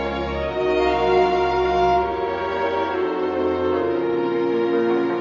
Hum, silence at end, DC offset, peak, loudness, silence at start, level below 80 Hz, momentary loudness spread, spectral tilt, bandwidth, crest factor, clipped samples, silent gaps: none; 0 s; under 0.1%; -8 dBFS; -21 LUFS; 0 s; -40 dBFS; 5 LU; -7 dB/octave; 7.2 kHz; 14 dB; under 0.1%; none